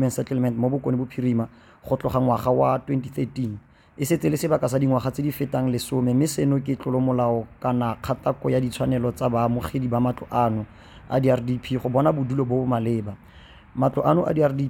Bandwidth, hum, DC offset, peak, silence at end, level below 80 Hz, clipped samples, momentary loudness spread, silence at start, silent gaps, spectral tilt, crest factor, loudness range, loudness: 17 kHz; none; under 0.1%; -6 dBFS; 0 s; -50 dBFS; under 0.1%; 7 LU; 0 s; none; -7.5 dB/octave; 18 dB; 1 LU; -23 LUFS